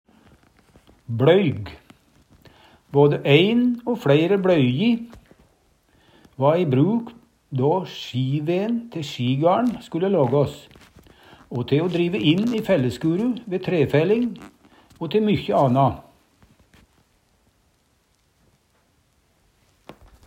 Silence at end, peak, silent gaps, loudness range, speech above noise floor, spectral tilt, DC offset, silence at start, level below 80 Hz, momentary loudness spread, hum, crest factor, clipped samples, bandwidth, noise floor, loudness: 0.35 s; -2 dBFS; none; 5 LU; 44 dB; -7.5 dB/octave; under 0.1%; 1.1 s; -58 dBFS; 13 LU; none; 20 dB; under 0.1%; 15.5 kHz; -64 dBFS; -21 LUFS